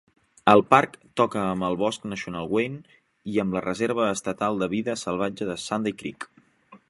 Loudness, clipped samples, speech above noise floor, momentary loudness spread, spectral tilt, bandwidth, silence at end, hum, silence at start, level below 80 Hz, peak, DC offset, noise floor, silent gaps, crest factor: -25 LUFS; under 0.1%; 30 dB; 13 LU; -5 dB/octave; 11.5 kHz; 0.15 s; none; 0.45 s; -60 dBFS; 0 dBFS; under 0.1%; -54 dBFS; none; 24 dB